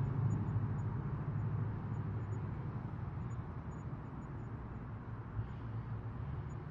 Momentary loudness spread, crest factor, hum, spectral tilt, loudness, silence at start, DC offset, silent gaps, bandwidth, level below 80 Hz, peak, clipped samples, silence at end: 9 LU; 16 dB; none; -9.5 dB/octave; -42 LUFS; 0 s; under 0.1%; none; 7.4 kHz; -52 dBFS; -24 dBFS; under 0.1%; 0 s